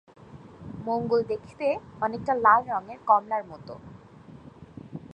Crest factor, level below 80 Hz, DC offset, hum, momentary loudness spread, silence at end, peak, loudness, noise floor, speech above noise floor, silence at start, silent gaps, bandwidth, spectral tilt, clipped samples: 22 dB; -60 dBFS; under 0.1%; none; 23 LU; 0 s; -6 dBFS; -26 LUFS; -48 dBFS; 23 dB; 0.35 s; none; 8.8 kHz; -7.5 dB/octave; under 0.1%